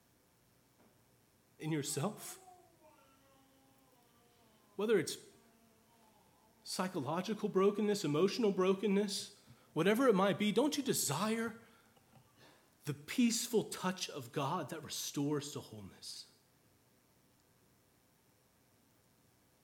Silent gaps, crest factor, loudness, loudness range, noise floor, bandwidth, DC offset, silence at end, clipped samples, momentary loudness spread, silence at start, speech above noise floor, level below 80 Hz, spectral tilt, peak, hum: none; 20 dB; -36 LUFS; 11 LU; -71 dBFS; 18.5 kHz; under 0.1%; 3.4 s; under 0.1%; 16 LU; 1.6 s; 36 dB; -84 dBFS; -4.5 dB/octave; -18 dBFS; none